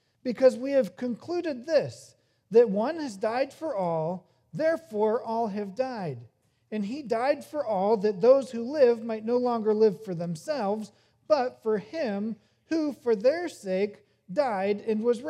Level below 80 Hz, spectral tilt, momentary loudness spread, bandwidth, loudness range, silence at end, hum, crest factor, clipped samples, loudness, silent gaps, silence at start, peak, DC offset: -80 dBFS; -6.5 dB/octave; 11 LU; 12.5 kHz; 5 LU; 0 s; none; 18 dB; under 0.1%; -27 LUFS; none; 0.25 s; -8 dBFS; under 0.1%